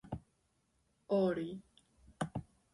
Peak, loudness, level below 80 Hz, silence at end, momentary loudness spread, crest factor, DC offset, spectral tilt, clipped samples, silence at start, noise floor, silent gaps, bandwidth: -22 dBFS; -38 LUFS; -64 dBFS; 0.3 s; 16 LU; 18 dB; under 0.1%; -7.5 dB/octave; under 0.1%; 0.05 s; -78 dBFS; none; 11.5 kHz